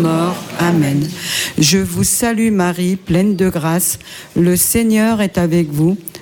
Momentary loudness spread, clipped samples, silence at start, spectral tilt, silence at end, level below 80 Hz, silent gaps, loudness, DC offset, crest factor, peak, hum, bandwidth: 6 LU; under 0.1%; 0 s; -4.5 dB/octave; 0 s; -40 dBFS; none; -15 LUFS; under 0.1%; 12 dB; -2 dBFS; none; 17.5 kHz